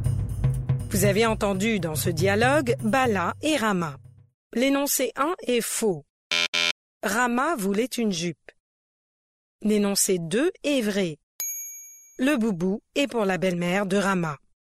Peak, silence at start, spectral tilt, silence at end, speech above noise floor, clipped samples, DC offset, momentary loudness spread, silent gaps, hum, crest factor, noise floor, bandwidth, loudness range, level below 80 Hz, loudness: -8 dBFS; 0 s; -4.5 dB/octave; 0.3 s; 21 dB; under 0.1%; under 0.1%; 9 LU; 4.34-4.50 s, 6.10-6.30 s, 6.48-6.53 s, 6.71-7.00 s, 8.60-9.59 s, 11.23-11.39 s; none; 16 dB; -44 dBFS; 16 kHz; 3 LU; -44 dBFS; -24 LUFS